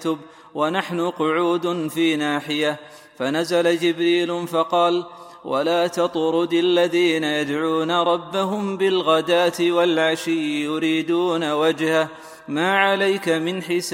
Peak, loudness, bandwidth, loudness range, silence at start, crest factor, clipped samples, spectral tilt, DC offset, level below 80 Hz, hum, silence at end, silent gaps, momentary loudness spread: -4 dBFS; -21 LUFS; 16.5 kHz; 2 LU; 0 s; 18 dB; under 0.1%; -4.5 dB/octave; under 0.1%; -70 dBFS; none; 0 s; none; 7 LU